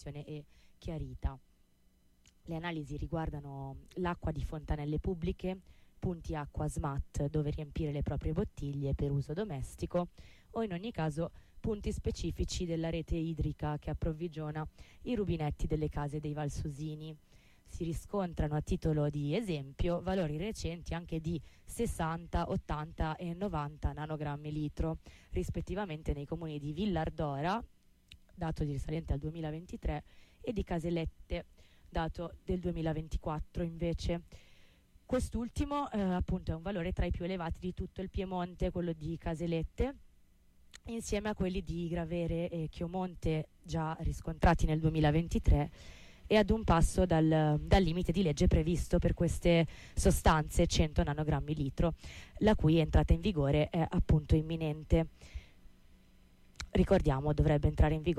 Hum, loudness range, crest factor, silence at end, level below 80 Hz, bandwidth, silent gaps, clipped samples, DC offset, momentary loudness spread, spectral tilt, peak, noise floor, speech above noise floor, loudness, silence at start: none; 8 LU; 18 dB; 0 s; -40 dBFS; 13.5 kHz; none; under 0.1%; under 0.1%; 12 LU; -6.5 dB/octave; -16 dBFS; -67 dBFS; 33 dB; -35 LUFS; 0 s